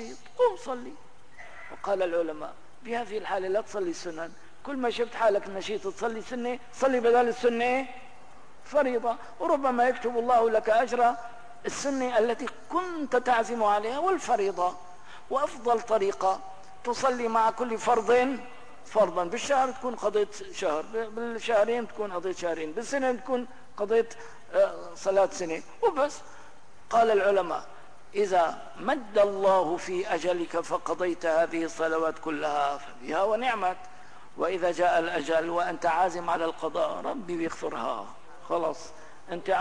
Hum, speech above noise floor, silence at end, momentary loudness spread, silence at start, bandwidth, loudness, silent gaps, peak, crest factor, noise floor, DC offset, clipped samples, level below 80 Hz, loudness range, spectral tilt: none; 27 dB; 0 s; 13 LU; 0 s; 10.5 kHz; -28 LUFS; none; -14 dBFS; 14 dB; -54 dBFS; 0.8%; under 0.1%; -64 dBFS; 4 LU; -4 dB/octave